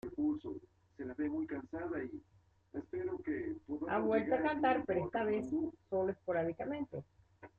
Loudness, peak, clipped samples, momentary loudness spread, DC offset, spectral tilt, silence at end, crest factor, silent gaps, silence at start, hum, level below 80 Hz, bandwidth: -38 LUFS; -20 dBFS; under 0.1%; 15 LU; under 0.1%; -8.5 dB/octave; 0.1 s; 18 dB; none; 0.05 s; none; -68 dBFS; 7 kHz